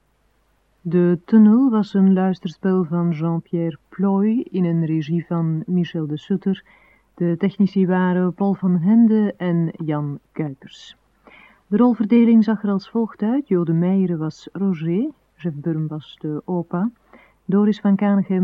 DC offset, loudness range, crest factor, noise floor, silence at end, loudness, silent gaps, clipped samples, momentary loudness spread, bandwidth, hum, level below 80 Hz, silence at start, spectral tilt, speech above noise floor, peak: under 0.1%; 5 LU; 16 dB; -63 dBFS; 0 s; -20 LUFS; none; under 0.1%; 13 LU; 6.2 kHz; none; -64 dBFS; 0.85 s; -10 dB/octave; 44 dB; -4 dBFS